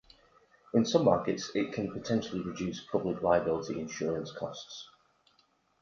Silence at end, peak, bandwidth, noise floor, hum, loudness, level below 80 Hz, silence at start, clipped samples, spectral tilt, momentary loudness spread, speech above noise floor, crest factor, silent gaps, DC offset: 0.95 s; -10 dBFS; 7.4 kHz; -70 dBFS; none; -31 LUFS; -62 dBFS; 0.75 s; under 0.1%; -5.5 dB/octave; 13 LU; 39 dB; 22 dB; none; under 0.1%